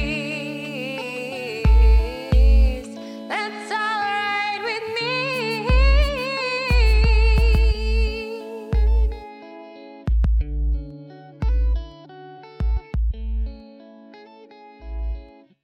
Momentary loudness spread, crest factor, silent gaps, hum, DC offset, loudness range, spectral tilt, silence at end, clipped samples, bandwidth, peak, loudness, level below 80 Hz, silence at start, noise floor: 21 LU; 14 dB; none; none; under 0.1%; 8 LU; -6 dB/octave; 0.35 s; under 0.1%; 8.6 kHz; -6 dBFS; -22 LUFS; -22 dBFS; 0 s; -45 dBFS